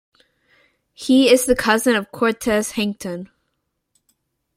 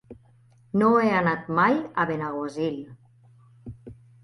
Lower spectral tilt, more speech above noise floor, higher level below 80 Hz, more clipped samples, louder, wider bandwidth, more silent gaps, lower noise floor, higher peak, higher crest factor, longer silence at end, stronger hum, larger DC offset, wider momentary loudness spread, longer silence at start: second, -3.5 dB/octave vs -7.5 dB/octave; first, 56 dB vs 34 dB; first, -48 dBFS vs -60 dBFS; neither; first, -18 LUFS vs -24 LUFS; first, 16.5 kHz vs 11 kHz; neither; first, -74 dBFS vs -57 dBFS; first, -2 dBFS vs -8 dBFS; about the same, 20 dB vs 18 dB; first, 1.3 s vs 0.3 s; neither; neither; second, 16 LU vs 24 LU; first, 1 s vs 0.1 s